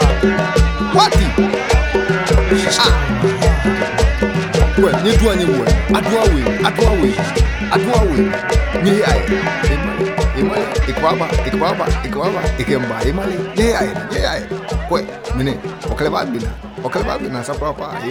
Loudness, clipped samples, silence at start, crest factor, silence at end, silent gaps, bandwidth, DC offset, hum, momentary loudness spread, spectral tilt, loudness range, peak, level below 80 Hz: -16 LUFS; under 0.1%; 0 s; 14 dB; 0 s; none; 16 kHz; under 0.1%; none; 8 LU; -5.5 dB/octave; 5 LU; 0 dBFS; -20 dBFS